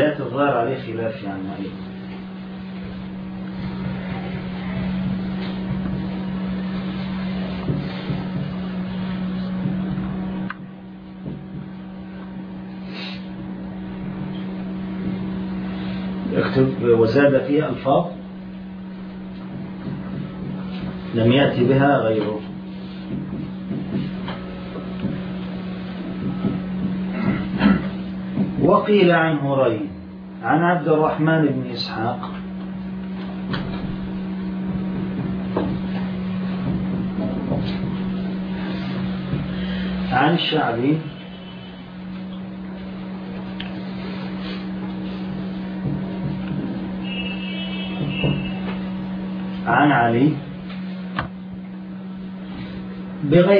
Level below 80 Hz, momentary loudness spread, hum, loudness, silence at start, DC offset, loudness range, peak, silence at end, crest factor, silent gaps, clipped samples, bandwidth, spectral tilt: -44 dBFS; 16 LU; none; -23 LUFS; 0 s; under 0.1%; 10 LU; -2 dBFS; 0 s; 20 dB; none; under 0.1%; 5.4 kHz; -9.5 dB/octave